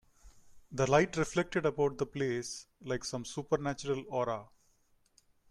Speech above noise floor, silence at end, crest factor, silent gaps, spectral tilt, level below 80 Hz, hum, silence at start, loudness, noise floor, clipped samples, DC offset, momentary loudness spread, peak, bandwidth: 37 dB; 1.05 s; 22 dB; none; -5 dB/octave; -60 dBFS; none; 0.25 s; -34 LUFS; -70 dBFS; under 0.1%; under 0.1%; 12 LU; -12 dBFS; 13 kHz